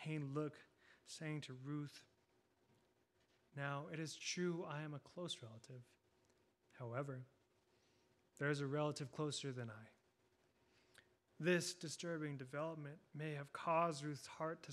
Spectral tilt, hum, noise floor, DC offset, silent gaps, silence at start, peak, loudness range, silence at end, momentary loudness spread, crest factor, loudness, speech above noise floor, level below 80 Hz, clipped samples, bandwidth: -5 dB/octave; none; -80 dBFS; under 0.1%; none; 0 s; -26 dBFS; 8 LU; 0 s; 16 LU; 22 dB; -46 LUFS; 34 dB; -90 dBFS; under 0.1%; 14 kHz